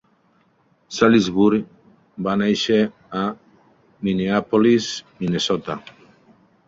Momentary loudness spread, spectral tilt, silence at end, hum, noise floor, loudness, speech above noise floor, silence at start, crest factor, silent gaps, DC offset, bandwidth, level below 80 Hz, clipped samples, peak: 16 LU; -5.5 dB/octave; 0.8 s; none; -61 dBFS; -20 LUFS; 42 dB; 0.9 s; 20 dB; none; under 0.1%; 7.8 kHz; -56 dBFS; under 0.1%; -2 dBFS